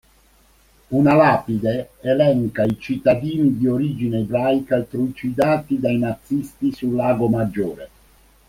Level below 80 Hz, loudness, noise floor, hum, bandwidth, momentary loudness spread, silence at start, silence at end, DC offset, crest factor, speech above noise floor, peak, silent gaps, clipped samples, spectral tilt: -50 dBFS; -20 LUFS; -55 dBFS; none; 16 kHz; 8 LU; 0.9 s; 0.6 s; under 0.1%; 18 dB; 36 dB; -2 dBFS; none; under 0.1%; -8 dB/octave